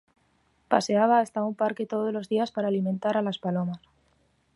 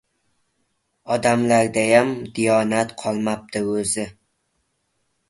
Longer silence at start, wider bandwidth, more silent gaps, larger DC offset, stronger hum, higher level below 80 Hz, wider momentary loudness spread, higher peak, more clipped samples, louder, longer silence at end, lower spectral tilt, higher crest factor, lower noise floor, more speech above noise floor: second, 0.7 s vs 1.05 s; about the same, 11.5 kHz vs 11.5 kHz; neither; neither; neither; second, -72 dBFS vs -58 dBFS; about the same, 7 LU vs 9 LU; second, -6 dBFS vs -2 dBFS; neither; second, -26 LUFS vs -20 LUFS; second, 0.8 s vs 1.2 s; first, -6 dB/octave vs -4.5 dB/octave; about the same, 22 dB vs 20 dB; about the same, -68 dBFS vs -71 dBFS; second, 42 dB vs 51 dB